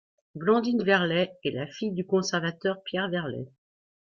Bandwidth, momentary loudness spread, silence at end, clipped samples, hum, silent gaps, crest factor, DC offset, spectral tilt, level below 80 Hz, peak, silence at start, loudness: 7.4 kHz; 11 LU; 0.55 s; under 0.1%; none; none; 20 dB; under 0.1%; -5.5 dB/octave; -68 dBFS; -8 dBFS; 0.35 s; -27 LUFS